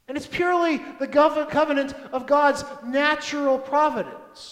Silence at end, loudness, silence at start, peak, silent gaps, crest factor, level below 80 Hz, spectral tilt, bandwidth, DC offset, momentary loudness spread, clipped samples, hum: 0 s; -22 LUFS; 0.1 s; -6 dBFS; none; 18 dB; -58 dBFS; -4 dB/octave; 13 kHz; under 0.1%; 10 LU; under 0.1%; none